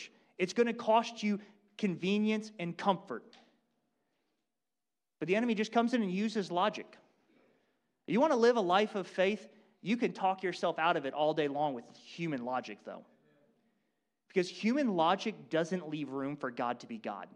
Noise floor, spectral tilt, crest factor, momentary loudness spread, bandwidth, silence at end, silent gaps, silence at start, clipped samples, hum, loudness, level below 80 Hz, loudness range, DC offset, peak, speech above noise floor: under -90 dBFS; -5.5 dB/octave; 20 dB; 12 LU; 10 kHz; 0.1 s; none; 0 s; under 0.1%; none; -33 LUFS; -84 dBFS; 6 LU; under 0.1%; -14 dBFS; over 57 dB